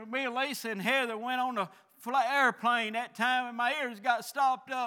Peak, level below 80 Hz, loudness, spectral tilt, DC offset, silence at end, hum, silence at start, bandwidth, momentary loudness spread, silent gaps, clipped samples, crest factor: -12 dBFS; under -90 dBFS; -30 LUFS; -3 dB/octave; under 0.1%; 0 s; none; 0 s; over 20 kHz; 7 LU; none; under 0.1%; 18 dB